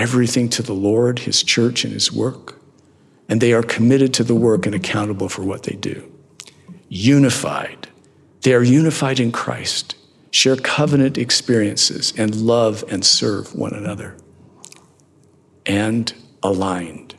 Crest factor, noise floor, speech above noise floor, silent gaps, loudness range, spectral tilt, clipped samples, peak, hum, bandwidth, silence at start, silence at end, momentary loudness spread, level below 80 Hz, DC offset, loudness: 18 dB; -53 dBFS; 36 dB; none; 5 LU; -4.5 dB/octave; under 0.1%; -2 dBFS; none; 13 kHz; 0 s; 0.15 s; 13 LU; -66 dBFS; under 0.1%; -17 LUFS